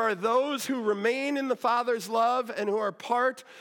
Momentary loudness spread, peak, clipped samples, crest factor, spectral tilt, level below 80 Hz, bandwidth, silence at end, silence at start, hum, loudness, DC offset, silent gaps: 4 LU; -14 dBFS; under 0.1%; 14 dB; -4 dB/octave; -90 dBFS; 17.5 kHz; 0 s; 0 s; none; -27 LUFS; under 0.1%; none